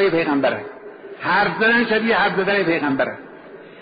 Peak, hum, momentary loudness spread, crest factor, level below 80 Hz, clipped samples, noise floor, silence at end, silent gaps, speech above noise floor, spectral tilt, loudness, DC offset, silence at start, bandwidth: -6 dBFS; none; 19 LU; 12 dB; -56 dBFS; under 0.1%; -40 dBFS; 0 s; none; 21 dB; -2.5 dB/octave; -18 LUFS; under 0.1%; 0 s; 5.2 kHz